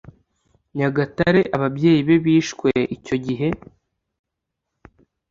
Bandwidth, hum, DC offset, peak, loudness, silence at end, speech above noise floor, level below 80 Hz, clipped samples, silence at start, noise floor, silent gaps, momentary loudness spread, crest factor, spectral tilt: 7.6 kHz; none; under 0.1%; -2 dBFS; -19 LUFS; 1.75 s; 62 dB; -52 dBFS; under 0.1%; 0.75 s; -81 dBFS; none; 9 LU; 18 dB; -7 dB/octave